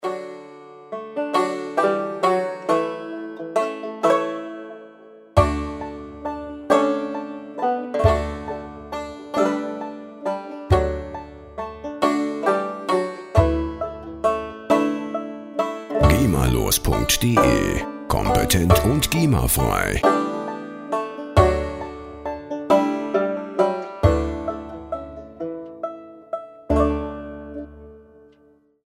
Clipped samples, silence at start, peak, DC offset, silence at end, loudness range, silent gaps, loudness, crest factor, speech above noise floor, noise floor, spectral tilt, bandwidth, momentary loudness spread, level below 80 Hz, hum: under 0.1%; 0 s; -2 dBFS; under 0.1%; 0.85 s; 7 LU; none; -22 LUFS; 22 dB; 39 dB; -57 dBFS; -5.5 dB/octave; 16 kHz; 15 LU; -34 dBFS; none